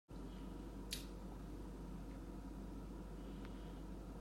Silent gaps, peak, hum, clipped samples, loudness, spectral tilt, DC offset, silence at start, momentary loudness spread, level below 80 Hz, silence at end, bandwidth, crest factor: none; -28 dBFS; none; under 0.1%; -52 LUFS; -5 dB/octave; under 0.1%; 0.1 s; 4 LU; -54 dBFS; 0 s; 16 kHz; 22 dB